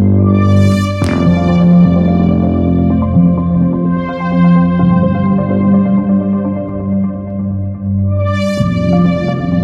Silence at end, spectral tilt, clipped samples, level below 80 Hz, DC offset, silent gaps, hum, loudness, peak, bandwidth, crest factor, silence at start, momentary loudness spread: 0 s; -9 dB/octave; under 0.1%; -36 dBFS; under 0.1%; none; none; -12 LUFS; 0 dBFS; 8 kHz; 10 dB; 0 s; 8 LU